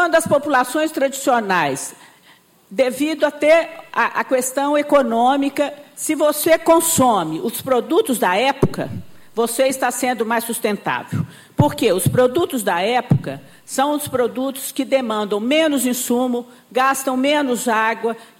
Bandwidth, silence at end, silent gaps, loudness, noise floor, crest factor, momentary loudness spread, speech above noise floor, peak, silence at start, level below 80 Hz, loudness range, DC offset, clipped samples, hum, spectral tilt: 17 kHz; 0.15 s; none; -18 LUFS; -51 dBFS; 14 dB; 9 LU; 33 dB; -4 dBFS; 0 s; -52 dBFS; 3 LU; under 0.1%; under 0.1%; none; -4.5 dB/octave